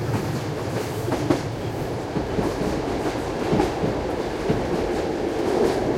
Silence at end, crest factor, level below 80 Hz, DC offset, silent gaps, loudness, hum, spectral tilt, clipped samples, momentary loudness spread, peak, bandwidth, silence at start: 0 s; 20 dB; -40 dBFS; under 0.1%; none; -25 LUFS; none; -6.5 dB/octave; under 0.1%; 5 LU; -4 dBFS; 16.5 kHz; 0 s